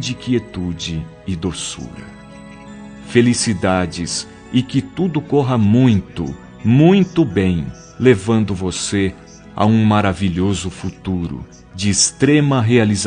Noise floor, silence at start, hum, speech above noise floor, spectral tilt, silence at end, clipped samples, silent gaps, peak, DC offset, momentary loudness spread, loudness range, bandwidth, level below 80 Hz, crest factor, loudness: -37 dBFS; 0 s; none; 21 dB; -5.5 dB/octave; 0 s; under 0.1%; none; 0 dBFS; under 0.1%; 18 LU; 5 LU; 10 kHz; -44 dBFS; 16 dB; -17 LUFS